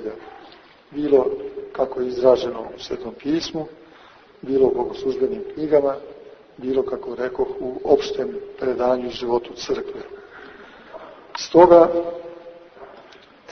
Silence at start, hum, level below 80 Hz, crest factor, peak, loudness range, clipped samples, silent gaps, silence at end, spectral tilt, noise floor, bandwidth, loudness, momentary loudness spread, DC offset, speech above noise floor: 0 s; none; -54 dBFS; 22 dB; 0 dBFS; 5 LU; under 0.1%; none; 0 s; -5.5 dB/octave; -48 dBFS; 6.6 kHz; -21 LUFS; 22 LU; under 0.1%; 28 dB